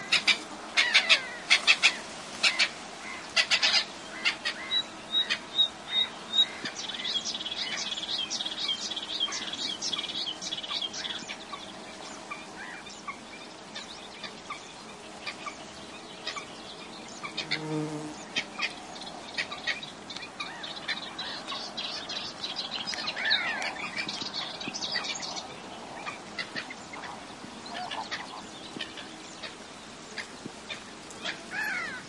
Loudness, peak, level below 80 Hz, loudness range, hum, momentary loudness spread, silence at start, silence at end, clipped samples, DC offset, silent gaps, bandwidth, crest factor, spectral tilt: -29 LUFS; -4 dBFS; -68 dBFS; 15 LU; none; 17 LU; 0 s; 0 s; under 0.1%; under 0.1%; none; 12 kHz; 28 dB; -1 dB/octave